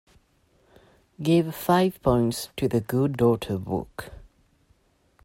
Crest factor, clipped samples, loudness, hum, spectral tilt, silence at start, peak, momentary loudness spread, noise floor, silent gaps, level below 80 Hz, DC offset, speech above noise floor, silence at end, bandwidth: 20 dB; under 0.1%; -24 LUFS; none; -6.5 dB/octave; 1.2 s; -6 dBFS; 9 LU; -64 dBFS; none; -48 dBFS; under 0.1%; 40 dB; 1 s; 16.5 kHz